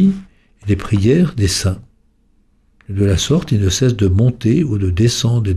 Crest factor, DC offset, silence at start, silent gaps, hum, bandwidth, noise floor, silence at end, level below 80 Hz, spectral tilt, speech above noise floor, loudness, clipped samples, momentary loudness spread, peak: 12 dB; under 0.1%; 0 s; none; none; 14 kHz; -55 dBFS; 0 s; -34 dBFS; -6 dB/octave; 41 dB; -15 LUFS; under 0.1%; 7 LU; -2 dBFS